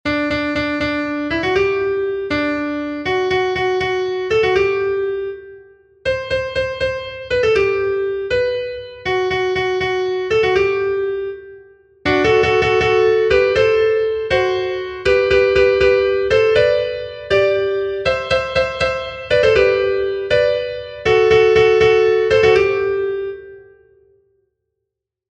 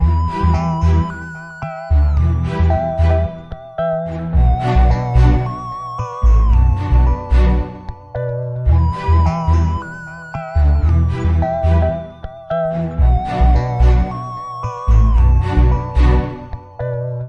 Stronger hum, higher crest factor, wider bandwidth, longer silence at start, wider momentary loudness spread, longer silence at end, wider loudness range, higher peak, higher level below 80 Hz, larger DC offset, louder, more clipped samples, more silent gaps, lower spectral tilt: neither; about the same, 16 dB vs 14 dB; first, 8.4 kHz vs 6.8 kHz; about the same, 0.05 s vs 0 s; second, 10 LU vs 13 LU; first, 1.65 s vs 0 s; first, 5 LU vs 2 LU; about the same, -2 dBFS vs -2 dBFS; second, -40 dBFS vs -16 dBFS; neither; about the same, -17 LUFS vs -17 LUFS; neither; neither; second, -5.5 dB/octave vs -9 dB/octave